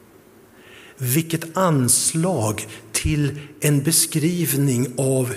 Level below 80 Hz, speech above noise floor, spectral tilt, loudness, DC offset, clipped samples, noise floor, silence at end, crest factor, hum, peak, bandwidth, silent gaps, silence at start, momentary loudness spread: -44 dBFS; 29 dB; -4.5 dB/octave; -20 LUFS; under 0.1%; under 0.1%; -49 dBFS; 0 s; 18 dB; none; -4 dBFS; 16 kHz; none; 0.7 s; 9 LU